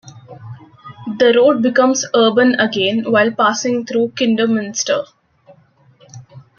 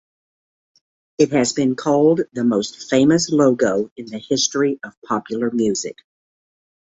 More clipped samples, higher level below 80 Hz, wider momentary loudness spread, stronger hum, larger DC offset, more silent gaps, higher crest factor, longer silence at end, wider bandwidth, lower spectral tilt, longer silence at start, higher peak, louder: neither; second, -64 dBFS vs -58 dBFS; first, 13 LU vs 10 LU; neither; neither; second, none vs 3.91-3.96 s, 4.97-5.02 s; about the same, 14 dB vs 18 dB; second, 0.2 s vs 1 s; second, 7.2 kHz vs 8 kHz; about the same, -3.5 dB/octave vs -4.5 dB/octave; second, 0.05 s vs 1.2 s; about the same, -2 dBFS vs -2 dBFS; first, -15 LUFS vs -18 LUFS